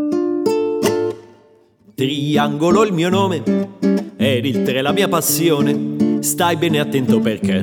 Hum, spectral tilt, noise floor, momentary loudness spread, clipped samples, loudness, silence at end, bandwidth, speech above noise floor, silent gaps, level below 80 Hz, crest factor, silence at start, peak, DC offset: none; -5 dB/octave; -51 dBFS; 5 LU; under 0.1%; -17 LUFS; 0 s; 19.5 kHz; 35 dB; none; -58 dBFS; 14 dB; 0 s; -2 dBFS; under 0.1%